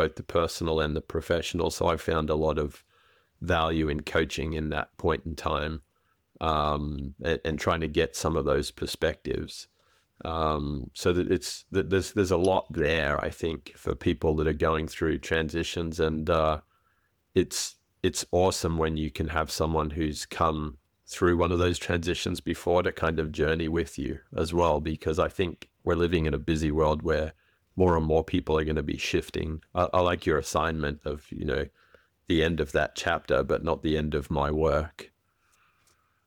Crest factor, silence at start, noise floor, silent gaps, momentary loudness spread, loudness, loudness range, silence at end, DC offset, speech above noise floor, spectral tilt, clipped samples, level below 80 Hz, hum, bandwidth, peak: 18 dB; 0 s; -71 dBFS; none; 8 LU; -28 LUFS; 3 LU; 1.2 s; under 0.1%; 44 dB; -5.5 dB/octave; under 0.1%; -42 dBFS; none; 18.5 kHz; -10 dBFS